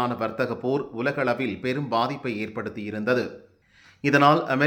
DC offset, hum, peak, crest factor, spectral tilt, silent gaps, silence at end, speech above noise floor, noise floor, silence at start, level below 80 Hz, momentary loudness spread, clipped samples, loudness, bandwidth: under 0.1%; none; -4 dBFS; 20 dB; -6.5 dB/octave; none; 0 s; 32 dB; -56 dBFS; 0 s; -66 dBFS; 12 LU; under 0.1%; -25 LUFS; 17 kHz